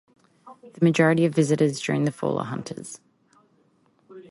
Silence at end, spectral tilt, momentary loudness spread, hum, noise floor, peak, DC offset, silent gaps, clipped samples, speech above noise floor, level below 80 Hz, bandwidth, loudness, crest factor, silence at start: 0.1 s; -6.5 dB/octave; 17 LU; none; -63 dBFS; -6 dBFS; under 0.1%; none; under 0.1%; 41 dB; -66 dBFS; 11.5 kHz; -23 LUFS; 18 dB; 0.45 s